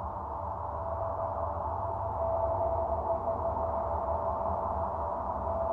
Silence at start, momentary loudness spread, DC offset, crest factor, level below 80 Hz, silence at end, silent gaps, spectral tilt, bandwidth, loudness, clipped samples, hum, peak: 0 s; 5 LU; under 0.1%; 14 dB; -46 dBFS; 0 s; none; -10.5 dB/octave; 4.1 kHz; -33 LUFS; under 0.1%; none; -18 dBFS